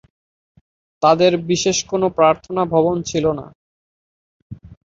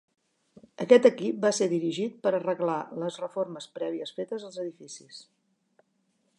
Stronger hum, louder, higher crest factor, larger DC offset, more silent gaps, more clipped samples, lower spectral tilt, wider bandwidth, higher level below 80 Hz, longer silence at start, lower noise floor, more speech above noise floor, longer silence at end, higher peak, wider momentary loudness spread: neither; first, -17 LUFS vs -27 LUFS; second, 18 dB vs 24 dB; neither; first, 3.55-4.50 s vs none; neither; about the same, -4.5 dB/octave vs -5 dB/octave; second, 7.8 kHz vs 11 kHz; first, -50 dBFS vs -82 dBFS; first, 1 s vs 0.8 s; first, under -90 dBFS vs -73 dBFS; first, over 73 dB vs 46 dB; second, 0.1 s vs 1.15 s; first, -2 dBFS vs -6 dBFS; second, 6 LU vs 20 LU